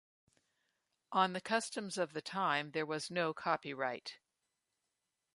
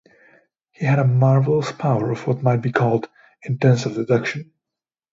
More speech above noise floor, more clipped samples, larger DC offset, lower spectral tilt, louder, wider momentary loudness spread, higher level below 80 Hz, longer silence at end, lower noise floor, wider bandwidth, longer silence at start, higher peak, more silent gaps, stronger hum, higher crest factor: second, 50 dB vs 69 dB; neither; neither; second, -3.5 dB/octave vs -7.5 dB/octave; second, -37 LUFS vs -20 LUFS; second, 6 LU vs 11 LU; second, -86 dBFS vs -60 dBFS; first, 1.2 s vs 0.7 s; about the same, -87 dBFS vs -87 dBFS; first, 11.5 kHz vs 7.6 kHz; first, 1.1 s vs 0.8 s; second, -18 dBFS vs -2 dBFS; neither; neither; about the same, 22 dB vs 18 dB